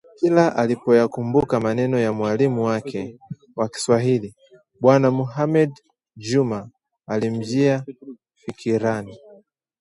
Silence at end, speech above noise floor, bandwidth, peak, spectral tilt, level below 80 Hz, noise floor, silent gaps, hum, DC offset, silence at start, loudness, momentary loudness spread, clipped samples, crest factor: 0.65 s; 32 dB; 11.5 kHz; -2 dBFS; -7 dB/octave; -58 dBFS; -52 dBFS; none; none; under 0.1%; 0.2 s; -21 LUFS; 17 LU; under 0.1%; 20 dB